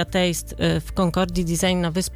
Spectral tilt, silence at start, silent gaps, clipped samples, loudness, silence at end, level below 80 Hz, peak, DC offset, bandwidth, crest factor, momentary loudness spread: -5 dB/octave; 0 s; none; under 0.1%; -22 LUFS; 0 s; -36 dBFS; -8 dBFS; under 0.1%; 16.5 kHz; 14 dB; 2 LU